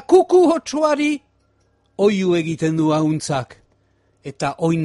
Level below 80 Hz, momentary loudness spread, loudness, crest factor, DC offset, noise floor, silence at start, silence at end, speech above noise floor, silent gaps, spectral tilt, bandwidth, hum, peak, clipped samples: -58 dBFS; 18 LU; -18 LUFS; 16 dB; under 0.1%; -61 dBFS; 0.1 s; 0 s; 44 dB; none; -6 dB/octave; 11.5 kHz; none; -2 dBFS; under 0.1%